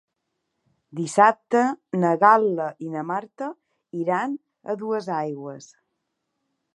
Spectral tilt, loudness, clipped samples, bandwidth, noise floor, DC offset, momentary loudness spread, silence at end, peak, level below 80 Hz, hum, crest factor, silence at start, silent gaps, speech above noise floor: -6 dB/octave; -22 LUFS; under 0.1%; 11.5 kHz; -78 dBFS; under 0.1%; 18 LU; 1.1 s; -2 dBFS; -82 dBFS; none; 22 dB; 0.95 s; none; 56 dB